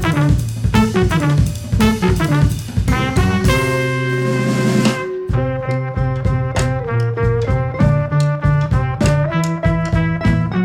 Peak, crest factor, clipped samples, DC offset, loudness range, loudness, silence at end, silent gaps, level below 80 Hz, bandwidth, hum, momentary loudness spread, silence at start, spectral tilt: -2 dBFS; 14 dB; under 0.1%; under 0.1%; 2 LU; -17 LUFS; 0 s; none; -26 dBFS; 17 kHz; none; 4 LU; 0 s; -6.5 dB/octave